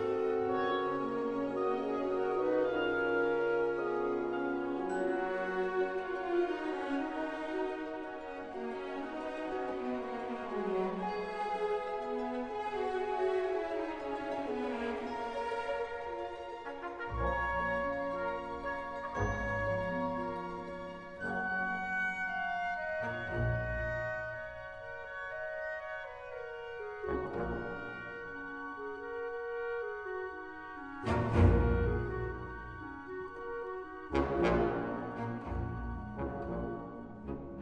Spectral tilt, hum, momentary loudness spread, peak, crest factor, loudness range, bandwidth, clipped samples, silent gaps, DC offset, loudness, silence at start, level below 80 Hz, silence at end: -7.5 dB/octave; none; 11 LU; -14 dBFS; 20 dB; 7 LU; 9.6 kHz; under 0.1%; none; under 0.1%; -36 LUFS; 0 s; -48 dBFS; 0 s